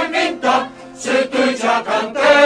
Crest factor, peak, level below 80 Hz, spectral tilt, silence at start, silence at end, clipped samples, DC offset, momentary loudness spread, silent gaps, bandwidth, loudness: 14 dB; 0 dBFS; -56 dBFS; -2.5 dB/octave; 0 s; 0 s; under 0.1%; under 0.1%; 4 LU; none; 10.5 kHz; -17 LUFS